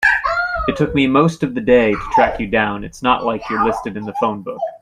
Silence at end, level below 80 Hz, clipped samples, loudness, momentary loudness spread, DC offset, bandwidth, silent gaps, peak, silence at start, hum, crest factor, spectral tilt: 0.05 s; -38 dBFS; under 0.1%; -17 LUFS; 8 LU; under 0.1%; 12.5 kHz; none; -2 dBFS; 0 s; none; 16 dB; -6 dB/octave